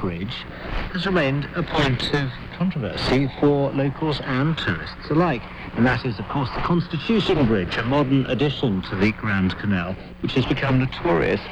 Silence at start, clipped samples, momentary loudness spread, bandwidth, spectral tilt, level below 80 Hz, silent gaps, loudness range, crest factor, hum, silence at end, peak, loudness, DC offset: 0 s; under 0.1%; 9 LU; 9.6 kHz; -7.5 dB/octave; -38 dBFS; none; 2 LU; 14 dB; none; 0 s; -6 dBFS; -22 LUFS; under 0.1%